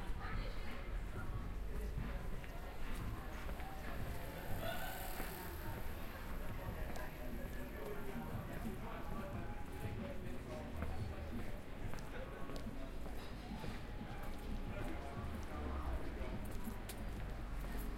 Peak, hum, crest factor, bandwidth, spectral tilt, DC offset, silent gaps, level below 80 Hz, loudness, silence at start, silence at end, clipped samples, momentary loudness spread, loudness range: -28 dBFS; none; 16 dB; 16.5 kHz; -6 dB/octave; under 0.1%; none; -46 dBFS; -47 LUFS; 0 s; 0 s; under 0.1%; 4 LU; 2 LU